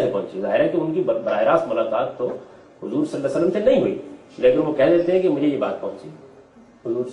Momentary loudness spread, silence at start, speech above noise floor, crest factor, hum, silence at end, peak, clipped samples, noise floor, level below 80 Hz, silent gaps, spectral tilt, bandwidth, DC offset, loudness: 15 LU; 0 s; 28 dB; 16 dB; none; 0 s; -4 dBFS; under 0.1%; -48 dBFS; -58 dBFS; none; -7.5 dB/octave; 10 kHz; under 0.1%; -21 LUFS